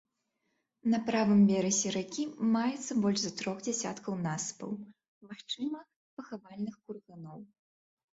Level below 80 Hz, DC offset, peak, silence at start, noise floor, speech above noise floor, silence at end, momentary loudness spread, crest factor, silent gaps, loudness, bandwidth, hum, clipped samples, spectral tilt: -74 dBFS; under 0.1%; -16 dBFS; 0.85 s; -81 dBFS; 49 dB; 0.75 s; 22 LU; 18 dB; 5.08-5.21 s, 5.96-6.17 s; -31 LUFS; 8 kHz; none; under 0.1%; -4.5 dB/octave